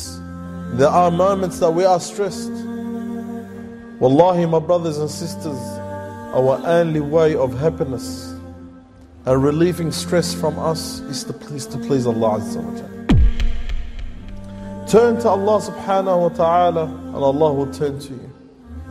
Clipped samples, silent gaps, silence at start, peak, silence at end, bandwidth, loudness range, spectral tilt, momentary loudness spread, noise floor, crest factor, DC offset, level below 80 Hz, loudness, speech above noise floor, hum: under 0.1%; none; 0 s; -2 dBFS; 0 s; 15 kHz; 4 LU; -6.5 dB/octave; 18 LU; -43 dBFS; 18 dB; under 0.1%; -30 dBFS; -19 LUFS; 25 dB; none